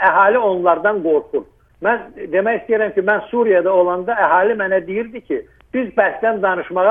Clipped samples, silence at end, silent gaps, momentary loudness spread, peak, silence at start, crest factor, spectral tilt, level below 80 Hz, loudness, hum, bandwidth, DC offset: under 0.1%; 0 s; none; 11 LU; 0 dBFS; 0 s; 16 dB; -8.5 dB/octave; -54 dBFS; -17 LUFS; none; 3.7 kHz; under 0.1%